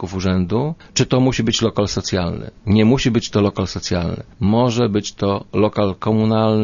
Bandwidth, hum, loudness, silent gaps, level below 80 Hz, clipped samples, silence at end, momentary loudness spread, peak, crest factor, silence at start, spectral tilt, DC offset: 7.4 kHz; none; -18 LUFS; none; -40 dBFS; under 0.1%; 0 s; 6 LU; -2 dBFS; 14 dB; 0 s; -6 dB/octave; under 0.1%